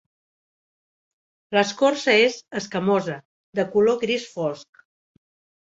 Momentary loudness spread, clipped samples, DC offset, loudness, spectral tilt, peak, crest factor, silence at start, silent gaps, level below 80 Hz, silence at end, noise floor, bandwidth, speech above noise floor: 13 LU; under 0.1%; under 0.1%; -22 LUFS; -4.5 dB/octave; -2 dBFS; 22 dB; 1.5 s; 3.25-3.53 s; -68 dBFS; 0.95 s; under -90 dBFS; 8 kHz; over 69 dB